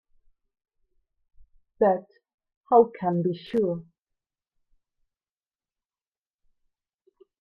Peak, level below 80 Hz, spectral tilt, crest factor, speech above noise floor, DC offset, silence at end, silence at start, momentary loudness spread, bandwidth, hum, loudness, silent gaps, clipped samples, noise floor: -6 dBFS; -68 dBFS; -9.5 dB/octave; 24 dB; over 67 dB; under 0.1%; 3.6 s; 1.8 s; 9 LU; 5.4 kHz; none; -24 LUFS; 2.34-2.38 s, 2.57-2.64 s; under 0.1%; under -90 dBFS